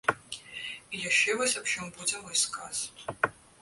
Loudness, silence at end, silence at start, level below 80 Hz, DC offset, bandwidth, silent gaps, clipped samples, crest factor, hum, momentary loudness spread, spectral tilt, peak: -29 LUFS; 0.3 s; 0.05 s; -66 dBFS; under 0.1%; 12 kHz; none; under 0.1%; 22 dB; none; 14 LU; -0.5 dB/octave; -10 dBFS